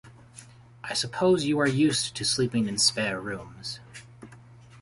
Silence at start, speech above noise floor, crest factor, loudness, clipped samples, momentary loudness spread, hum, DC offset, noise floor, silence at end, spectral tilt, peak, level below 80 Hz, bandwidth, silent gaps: 0.05 s; 24 dB; 18 dB; -25 LUFS; under 0.1%; 17 LU; none; under 0.1%; -50 dBFS; 0 s; -3.5 dB/octave; -10 dBFS; -60 dBFS; 11.5 kHz; none